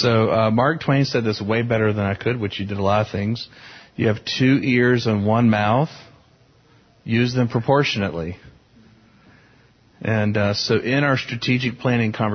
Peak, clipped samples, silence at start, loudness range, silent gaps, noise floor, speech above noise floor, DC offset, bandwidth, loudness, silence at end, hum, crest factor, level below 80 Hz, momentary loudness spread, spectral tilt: -4 dBFS; under 0.1%; 0 s; 4 LU; none; -55 dBFS; 35 dB; under 0.1%; 6.6 kHz; -20 LUFS; 0 s; none; 16 dB; -48 dBFS; 9 LU; -6.5 dB/octave